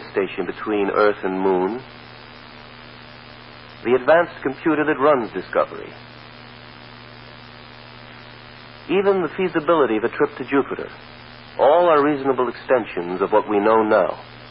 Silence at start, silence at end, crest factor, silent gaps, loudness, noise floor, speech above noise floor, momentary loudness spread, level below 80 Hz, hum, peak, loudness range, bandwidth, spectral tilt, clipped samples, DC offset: 0 s; 0 s; 16 dB; none; -19 LUFS; -41 dBFS; 22 dB; 24 LU; -54 dBFS; none; -4 dBFS; 8 LU; 5.6 kHz; -10.5 dB/octave; under 0.1%; under 0.1%